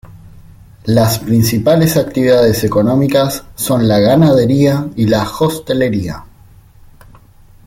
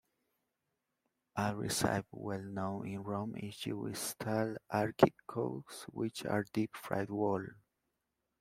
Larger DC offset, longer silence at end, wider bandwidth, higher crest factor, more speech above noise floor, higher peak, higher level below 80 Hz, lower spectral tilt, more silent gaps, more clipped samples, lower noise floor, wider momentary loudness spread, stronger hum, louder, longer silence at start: neither; first, 1.4 s vs 0.85 s; about the same, 17 kHz vs 16 kHz; second, 12 dB vs 30 dB; second, 30 dB vs 50 dB; first, 0 dBFS vs -6 dBFS; first, -40 dBFS vs -68 dBFS; about the same, -6 dB/octave vs -5 dB/octave; neither; neither; second, -42 dBFS vs -86 dBFS; second, 8 LU vs 11 LU; neither; first, -12 LUFS vs -37 LUFS; second, 0.1 s vs 1.35 s